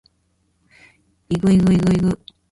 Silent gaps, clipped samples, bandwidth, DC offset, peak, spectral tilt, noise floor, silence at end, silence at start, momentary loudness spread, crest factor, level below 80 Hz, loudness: none; under 0.1%; 11.5 kHz; under 0.1%; -6 dBFS; -8 dB/octave; -65 dBFS; 0.35 s; 1.3 s; 11 LU; 14 dB; -42 dBFS; -18 LUFS